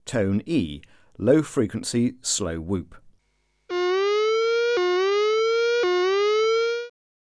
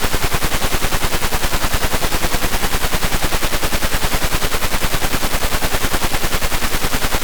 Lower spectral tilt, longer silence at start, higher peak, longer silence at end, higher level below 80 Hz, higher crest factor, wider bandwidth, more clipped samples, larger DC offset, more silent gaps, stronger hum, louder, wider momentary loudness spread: first, -4.5 dB/octave vs -3 dB/octave; about the same, 0.05 s vs 0 s; about the same, -6 dBFS vs -8 dBFS; first, 0.45 s vs 0 s; second, -52 dBFS vs -20 dBFS; first, 16 dB vs 8 dB; second, 11 kHz vs over 20 kHz; neither; neither; neither; neither; second, -23 LUFS vs -19 LUFS; first, 9 LU vs 0 LU